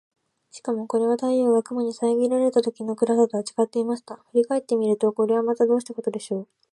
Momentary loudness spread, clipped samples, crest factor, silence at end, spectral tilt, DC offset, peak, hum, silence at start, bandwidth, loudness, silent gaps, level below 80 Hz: 9 LU; under 0.1%; 16 dB; 0.3 s; -6 dB/octave; under 0.1%; -6 dBFS; none; 0.55 s; 11.5 kHz; -23 LUFS; none; -78 dBFS